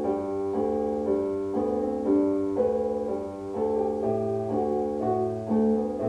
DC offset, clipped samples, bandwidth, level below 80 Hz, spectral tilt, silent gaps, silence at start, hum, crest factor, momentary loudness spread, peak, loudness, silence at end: under 0.1%; under 0.1%; 10 kHz; -54 dBFS; -9 dB/octave; none; 0 s; none; 14 dB; 5 LU; -12 dBFS; -27 LUFS; 0 s